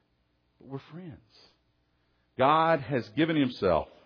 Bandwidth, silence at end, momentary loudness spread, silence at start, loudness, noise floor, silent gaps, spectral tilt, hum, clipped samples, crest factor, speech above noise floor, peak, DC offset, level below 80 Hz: 5.4 kHz; 0.2 s; 22 LU; 0.65 s; -26 LUFS; -72 dBFS; none; -8 dB/octave; none; under 0.1%; 20 dB; 44 dB; -10 dBFS; under 0.1%; -58 dBFS